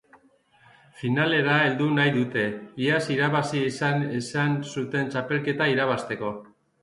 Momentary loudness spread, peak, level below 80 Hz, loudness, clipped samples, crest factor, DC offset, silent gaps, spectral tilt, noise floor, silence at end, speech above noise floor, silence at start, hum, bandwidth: 8 LU; -8 dBFS; -66 dBFS; -25 LUFS; under 0.1%; 18 dB; under 0.1%; none; -6 dB/octave; -60 dBFS; 0.4 s; 35 dB; 0.95 s; none; 11.5 kHz